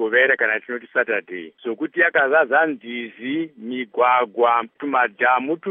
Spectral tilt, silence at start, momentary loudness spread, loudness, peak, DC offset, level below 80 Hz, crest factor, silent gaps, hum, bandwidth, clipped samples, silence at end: -1 dB/octave; 0 s; 13 LU; -20 LUFS; -2 dBFS; under 0.1%; -84 dBFS; 18 dB; none; none; 3.8 kHz; under 0.1%; 0 s